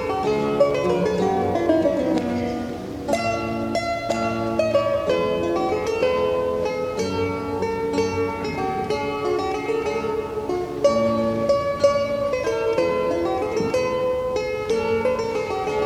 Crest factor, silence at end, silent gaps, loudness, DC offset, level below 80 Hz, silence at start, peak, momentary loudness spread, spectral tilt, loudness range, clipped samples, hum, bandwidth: 16 dB; 0 s; none; -22 LUFS; under 0.1%; -46 dBFS; 0 s; -6 dBFS; 6 LU; -6 dB/octave; 3 LU; under 0.1%; none; 16 kHz